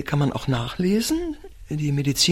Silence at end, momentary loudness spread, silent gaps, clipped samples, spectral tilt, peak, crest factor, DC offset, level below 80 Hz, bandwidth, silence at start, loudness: 0 s; 11 LU; none; under 0.1%; -4.5 dB/octave; -6 dBFS; 16 dB; under 0.1%; -42 dBFS; 16.5 kHz; 0 s; -24 LUFS